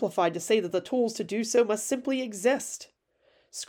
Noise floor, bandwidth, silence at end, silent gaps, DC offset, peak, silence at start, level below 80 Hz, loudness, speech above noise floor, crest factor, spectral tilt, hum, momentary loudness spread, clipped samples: -67 dBFS; 18.5 kHz; 0.05 s; none; under 0.1%; -12 dBFS; 0 s; -76 dBFS; -27 LUFS; 40 dB; 16 dB; -3.5 dB/octave; none; 7 LU; under 0.1%